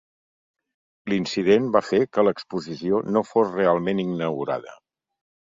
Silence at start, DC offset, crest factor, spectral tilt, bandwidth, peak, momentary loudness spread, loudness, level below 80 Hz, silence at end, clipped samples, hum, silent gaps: 1.05 s; under 0.1%; 20 dB; -6.5 dB/octave; 7.8 kHz; -4 dBFS; 10 LU; -23 LUFS; -64 dBFS; 0.75 s; under 0.1%; none; none